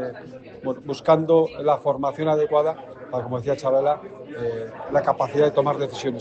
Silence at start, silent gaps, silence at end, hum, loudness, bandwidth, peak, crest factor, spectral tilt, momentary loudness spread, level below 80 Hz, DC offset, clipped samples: 0 s; none; 0 s; none; -23 LUFS; 8.2 kHz; -4 dBFS; 18 dB; -7 dB/octave; 13 LU; -60 dBFS; under 0.1%; under 0.1%